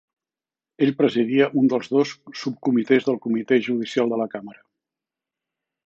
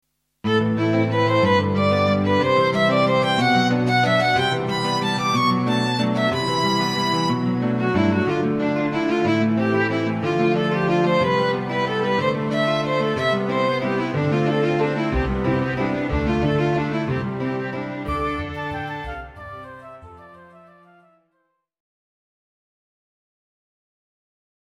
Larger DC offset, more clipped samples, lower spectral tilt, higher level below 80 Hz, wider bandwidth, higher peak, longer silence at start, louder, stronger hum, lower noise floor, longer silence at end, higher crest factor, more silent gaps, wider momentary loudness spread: neither; neither; about the same, -6.5 dB/octave vs -6 dB/octave; second, -74 dBFS vs -42 dBFS; second, 7.6 kHz vs 13.5 kHz; about the same, -4 dBFS vs -6 dBFS; first, 0.8 s vs 0.45 s; about the same, -22 LUFS vs -20 LUFS; neither; first, under -90 dBFS vs -71 dBFS; second, 1.35 s vs 4.3 s; about the same, 18 dB vs 16 dB; neither; about the same, 8 LU vs 8 LU